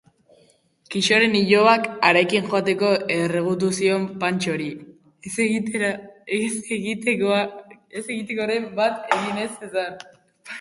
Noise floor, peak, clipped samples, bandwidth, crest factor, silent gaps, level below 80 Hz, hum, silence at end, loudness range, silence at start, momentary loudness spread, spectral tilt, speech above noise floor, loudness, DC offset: -59 dBFS; -2 dBFS; under 0.1%; 11.5 kHz; 22 dB; none; -66 dBFS; none; 0 s; 6 LU; 0.9 s; 14 LU; -4.5 dB/octave; 37 dB; -21 LUFS; under 0.1%